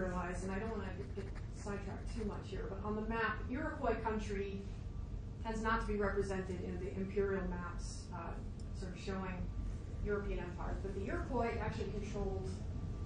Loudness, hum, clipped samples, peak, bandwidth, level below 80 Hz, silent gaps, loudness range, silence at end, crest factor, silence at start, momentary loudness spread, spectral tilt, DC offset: -41 LUFS; none; under 0.1%; -22 dBFS; 10 kHz; -46 dBFS; none; 3 LU; 0 s; 18 dB; 0 s; 9 LU; -6.5 dB/octave; under 0.1%